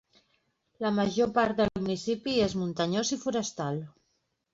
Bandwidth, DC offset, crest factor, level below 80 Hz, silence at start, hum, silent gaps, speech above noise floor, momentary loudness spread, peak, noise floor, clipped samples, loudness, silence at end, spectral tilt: 7.8 kHz; under 0.1%; 18 dB; -58 dBFS; 0.8 s; none; none; 48 dB; 8 LU; -12 dBFS; -77 dBFS; under 0.1%; -29 LUFS; 0.65 s; -5 dB/octave